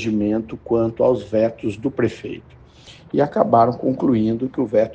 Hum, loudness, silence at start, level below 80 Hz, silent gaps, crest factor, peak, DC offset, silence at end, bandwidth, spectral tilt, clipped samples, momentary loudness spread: none; -20 LUFS; 0 s; -52 dBFS; none; 18 dB; 0 dBFS; under 0.1%; 0 s; 8.6 kHz; -8.5 dB/octave; under 0.1%; 9 LU